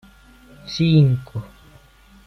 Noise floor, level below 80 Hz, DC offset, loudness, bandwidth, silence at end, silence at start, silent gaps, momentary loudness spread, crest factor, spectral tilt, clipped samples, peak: -50 dBFS; -48 dBFS; under 0.1%; -18 LUFS; 6.4 kHz; 0.8 s; 0.65 s; none; 19 LU; 18 dB; -7.5 dB/octave; under 0.1%; -4 dBFS